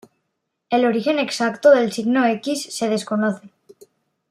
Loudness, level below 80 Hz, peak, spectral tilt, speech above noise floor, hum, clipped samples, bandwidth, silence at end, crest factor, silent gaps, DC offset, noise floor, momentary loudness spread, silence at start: -19 LUFS; -72 dBFS; -2 dBFS; -4.5 dB/octave; 57 dB; none; under 0.1%; 14 kHz; 0.85 s; 18 dB; none; under 0.1%; -76 dBFS; 9 LU; 0.7 s